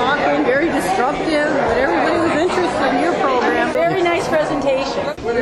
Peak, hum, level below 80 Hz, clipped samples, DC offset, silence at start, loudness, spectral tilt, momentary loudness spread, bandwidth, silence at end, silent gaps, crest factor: -2 dBFS; none; -42 dBFS; under 0.1%; under 0.1%; 0 s; -17 LUFS; -5 dB/octave; 2 LU; 12.5 kHz; 0 s; none; 14 dB